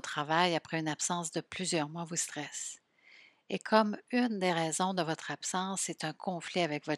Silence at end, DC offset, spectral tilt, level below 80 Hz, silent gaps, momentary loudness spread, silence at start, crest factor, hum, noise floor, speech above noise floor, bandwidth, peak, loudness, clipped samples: 0 s; under 0.1%; -3.5 dB/octave; -80 dBFS; none; 10 LU; 0.05 s; 24 dB; none; -61 dBFS; 27 dB; 14 kHz; -10 dBFS; -33 LUFS; under 0.1%